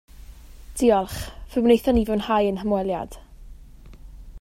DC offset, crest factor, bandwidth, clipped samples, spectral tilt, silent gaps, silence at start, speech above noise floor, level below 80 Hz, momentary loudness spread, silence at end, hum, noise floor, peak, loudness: under 0.1%; 18 dB; 16 kHz; under 0.1%; -6 dB/octave; none; 0.2 s; 23 dB; -40 dBFS; 14 LU; 0 s; none; -44 dBFS; -6 dBFS; -22 LUFS